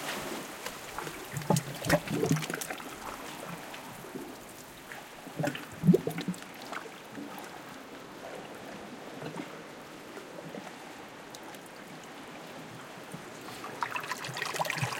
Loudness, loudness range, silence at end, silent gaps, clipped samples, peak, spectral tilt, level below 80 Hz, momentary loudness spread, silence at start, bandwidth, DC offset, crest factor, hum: -36 LUFS; 11 LU; 0 s; none; under 0.1%; -12 dBFS; -5 dB/octave; -64 dBFS; 16 LU; 0 s; 17 kHz; under 0.1%; 24 dB; none